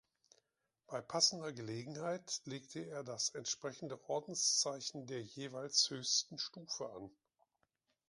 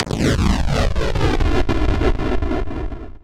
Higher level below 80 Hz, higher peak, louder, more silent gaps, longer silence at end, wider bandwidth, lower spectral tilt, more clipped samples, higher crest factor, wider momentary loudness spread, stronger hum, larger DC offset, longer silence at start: second, -84 dBFS vs -22 dBFS; second, -18 dBFS vs -4 dBFS; second, -38 LUFS vs -20 LUFS; neither; first, 1 s vs 0 s; second, 11.5 kHz vs 13 kHz; second, -2 dB/octave vs -6 dB/octave; neither; first, 24 dB vs 14 dB; first, 14 LU vs 7 LU; neither; neither; first, 0.9 s vs 0 s